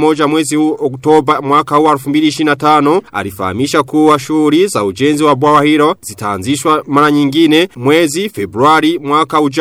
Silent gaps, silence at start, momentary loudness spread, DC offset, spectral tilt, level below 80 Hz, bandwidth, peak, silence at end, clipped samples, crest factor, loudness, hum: none; 0 s; 7 LU; under 0.1%; -5 dB/octave; -52 dBFS; 15.5 kHz; 0 dBFS; 0 s; under 0.1%; 10 dB; -11 LUFS; none